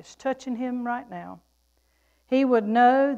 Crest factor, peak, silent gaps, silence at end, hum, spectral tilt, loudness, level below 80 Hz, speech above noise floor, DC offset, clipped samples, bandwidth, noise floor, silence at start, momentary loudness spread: 16 dB; -8 dBFS; none; 0 s; none; -6 dB/octave; -24 LUFS; -68 dBFS; 44 dB; under 0.1%; under 0.1%; 8.2 kHz; -67 dBFS; 0.1 s; 20 LU